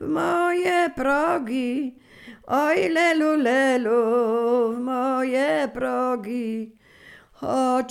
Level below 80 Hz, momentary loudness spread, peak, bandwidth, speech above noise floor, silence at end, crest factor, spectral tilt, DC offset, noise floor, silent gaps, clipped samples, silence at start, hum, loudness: -58 dBFS; 9 LU; -8 dBFS; 16 kHz; 28 dB; 0 s; 14 dB; -4.5 dB/octave; under 0.1%; -49 dBFS; none; under 0.1%; 0 s; none; -22 LUFS